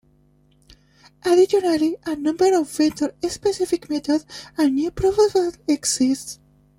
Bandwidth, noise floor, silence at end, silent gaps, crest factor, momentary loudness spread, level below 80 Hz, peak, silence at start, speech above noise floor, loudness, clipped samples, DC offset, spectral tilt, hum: 16.5 kHz; -58 dBFS; 0.45 s; none; 16 dB; 8 LU; -50 dBFS; -6 dBFS; 1.25 s; 38 dB; -20 LUFS; under 0.1%; under 0.1%; -4 dB/octave; 50 Hz at -55 dBFS